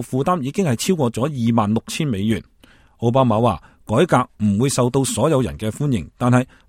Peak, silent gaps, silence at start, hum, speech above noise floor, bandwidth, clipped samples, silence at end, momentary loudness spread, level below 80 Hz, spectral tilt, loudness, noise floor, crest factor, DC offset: 0 dBFS; none; 0 s; none; 33 dB; 16 kHz; under 0.1%; 0.25 s; 6 LU; -46 dBFS; -6 dB/octave; -19 LUFS; -51 dBFS; 18 dB; under 0.1%